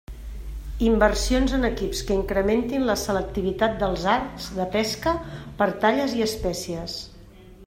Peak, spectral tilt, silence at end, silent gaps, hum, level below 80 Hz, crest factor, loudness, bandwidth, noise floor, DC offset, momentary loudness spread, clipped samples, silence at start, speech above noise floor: -4 dBFS; -4.5 dB/octave; 0 s; none; none; -34 dBFS; 20 dB; -24 LUFS; 16 kHz; -46 dBFS; under 0.1%; 14 LU; under 0.1%; 0.1 s; 23 dB